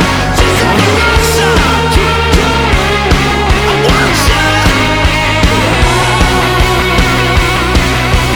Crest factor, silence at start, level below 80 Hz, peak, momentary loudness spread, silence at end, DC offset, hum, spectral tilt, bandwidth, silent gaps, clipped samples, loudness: 8 dB; 0 s; -16 dBFS; 0 dBFS; 2 LU; 0 s; under 0.1%; none; -4.5 dB/octave; over 20 kHz; none; under 0.1%; -9 LUFS